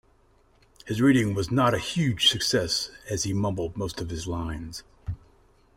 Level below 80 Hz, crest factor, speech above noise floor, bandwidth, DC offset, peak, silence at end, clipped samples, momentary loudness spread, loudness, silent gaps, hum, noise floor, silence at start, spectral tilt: -48 dBFS; 20 dB; 35 dB; 16 kHz; under 0.1%; -8 dBFS; 0.6 s; under 0.1%; 18 LU; -25 LUFS; none; none; -61 dBFS; 0.85 s; -4.5 dB/octave